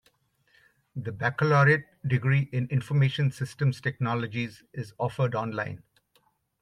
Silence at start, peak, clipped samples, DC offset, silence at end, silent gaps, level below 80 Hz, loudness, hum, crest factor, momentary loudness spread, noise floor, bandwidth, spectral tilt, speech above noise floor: 0.95 s; -10 dBFS; under 0.1%; under 0.1%; 0.85 s; none; -64 dBFS; -27 LUFS; none; 18 dB; 15 LU; -69 dBFS; 10.5 kHz; -7.5 dB/octave; 42 dB